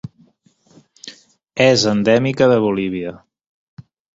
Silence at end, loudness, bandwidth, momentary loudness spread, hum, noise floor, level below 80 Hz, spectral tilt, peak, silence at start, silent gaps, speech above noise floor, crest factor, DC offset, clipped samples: 0.35 s; -15 LUFS; 7.8 kHz; 23 LU; none; -56 dBFS; -54 dBFS; -5 dB/octave; -2 dBFS; 0.05 s; 3.47-3.77 s; 41 dB; 18 dB; under 0.1%; under 0.1%